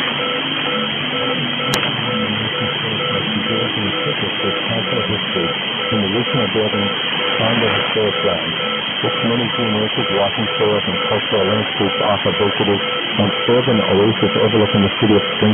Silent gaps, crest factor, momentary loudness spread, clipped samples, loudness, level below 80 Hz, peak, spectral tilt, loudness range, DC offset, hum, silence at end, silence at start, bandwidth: none; 16 dB; 4 LU; under 0.1%; -16 LUFS; -52 dBFS; 0 dBFS; -5.5 dB/octave; 3 LU; under 0.1%; none; 0 s; 0 s; 11.5 kHz